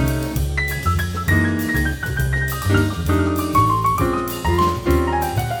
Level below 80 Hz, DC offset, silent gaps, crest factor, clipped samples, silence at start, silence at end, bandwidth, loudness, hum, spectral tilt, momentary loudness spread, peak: -28 dBFS; under 0.1%; none; 16 dB; under 0.1%; 0 s; 0 s; over 20 kHz; -19 LUFS; none; -6 dB/octave; 5 LU; -4 dBFS